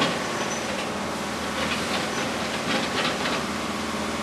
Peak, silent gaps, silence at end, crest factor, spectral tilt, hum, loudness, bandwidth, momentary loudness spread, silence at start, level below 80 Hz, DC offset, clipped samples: -8 dBFS; none; 0 s; 18 dB; -3 dB/octave; none; -26 LUFS; 14 kHz; 4 LU; 0 s; -50 dBFS; under 0.1%; under 0.1%